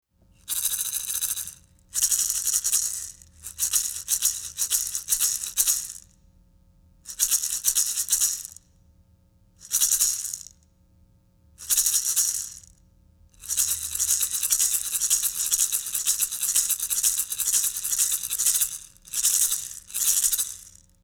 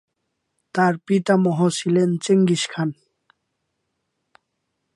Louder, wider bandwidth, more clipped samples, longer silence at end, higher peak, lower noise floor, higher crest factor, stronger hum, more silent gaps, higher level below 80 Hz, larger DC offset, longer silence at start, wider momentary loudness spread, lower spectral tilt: about the same, -22 LUFS vs -20 LUFS; first, over 20 kHz vs 11.5 kHz; neither; second, 0.35 s vs 2.05 s; about the same, -4 dBFS vs -4 dBFS; second, -60 dBFS vs -76 dBFS; first, 24 dB vs 18 dB; neither; neither; first, -56 dBFS vs -70 dBFS; neither; second, 0.45 s vs 0.75 s; first, 11 LU vs 8 LU; second, 3 dB/octave vs -6 dB/octave